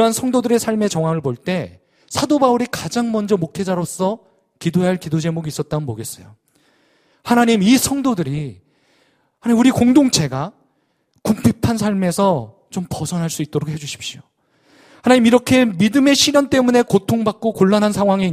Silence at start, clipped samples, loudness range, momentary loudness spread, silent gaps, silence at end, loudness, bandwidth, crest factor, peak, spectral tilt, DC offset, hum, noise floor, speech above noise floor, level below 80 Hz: 0 s; under 0.1%; 7 LU; 14 LU; none; 0 s; -17 LUFS; 15.5 kHz; 18 dB; 0 dBFS; -5 dB/octave; under 0.1%; none; -65 dBFS; 49 dB; -50 dBFS